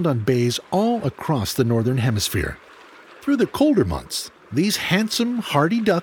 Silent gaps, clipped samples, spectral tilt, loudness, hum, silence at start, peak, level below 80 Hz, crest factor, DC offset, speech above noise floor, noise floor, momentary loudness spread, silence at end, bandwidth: none; under 0.1%; -5.5 dB/octave; -21 LUFS; none; 0 s; -2 dBFS; -44 dBFS; 18 dB; under 0.1%; 25 dB; -45 dBFS; 8 LU; 0 s; 20 kHz